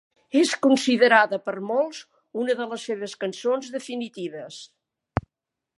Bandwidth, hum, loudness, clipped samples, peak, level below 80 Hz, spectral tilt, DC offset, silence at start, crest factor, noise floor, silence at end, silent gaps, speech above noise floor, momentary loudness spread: 11.5 kHz; none; -24 LUFS; under 0.1%; -2 dBFS; -54 dBFS; -4 dB/octave; under 0.1%; 0.35 s; 22 dB; -85 dBFS; 0.6 s; none; 62 dB; 17 LU